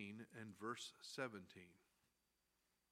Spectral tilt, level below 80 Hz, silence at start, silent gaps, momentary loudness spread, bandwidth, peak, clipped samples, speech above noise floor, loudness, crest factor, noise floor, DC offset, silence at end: -4 dB/octave; under -90 dBFS; 0 s; none; 14 LU; 16 kHz; -32 dBFS; under 0.1%; 33 dB; -52 LUFS; 24 dB; -87 dBFS; under 0.1%; 1.15 s